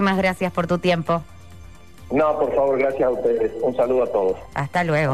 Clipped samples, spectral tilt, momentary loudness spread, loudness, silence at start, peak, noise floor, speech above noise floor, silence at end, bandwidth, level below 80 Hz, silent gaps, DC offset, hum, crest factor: under 0.1%; -7 dB/octave; 5 LU; -21 LUFS; 0 s; -8 dBFS; -43 dBFS; 23 dB; 0 s; 13.5 kHz; -48 dBFS; none; 0.6%; none; 12 dB